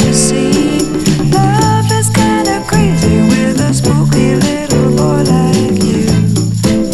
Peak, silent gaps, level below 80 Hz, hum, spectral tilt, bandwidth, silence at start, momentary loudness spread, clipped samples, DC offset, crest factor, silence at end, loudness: 0 dBFS; none; -30 dBFS; none; -5.5 dB/octave; 14.5 kHz; 0 s; 3 LU; under 0.1%; under 0.1%; 10 dB; 0 s; -11 LUFS